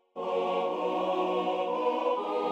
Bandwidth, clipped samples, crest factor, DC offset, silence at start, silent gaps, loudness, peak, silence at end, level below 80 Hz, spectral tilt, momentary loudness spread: 8.6 kHz; under 0.1%; 14 dB; under 0.1%; 0.15 s; none; -30 LUFS; -16 dBFS; 0 s; -80 dBFS; -6 dB/octave; 2 LU